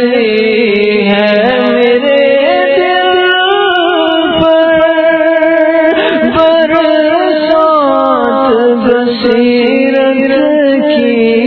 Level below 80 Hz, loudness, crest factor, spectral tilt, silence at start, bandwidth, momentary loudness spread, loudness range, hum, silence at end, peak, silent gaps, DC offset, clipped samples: -44 dBFS; -8 LUFS; 8 dB; -7.5 dB/octave; 0 s; 6 kHz; 2 LU; 1 LU; none; 0 s; 0 dBFS; none; under 0.1%; 0.3%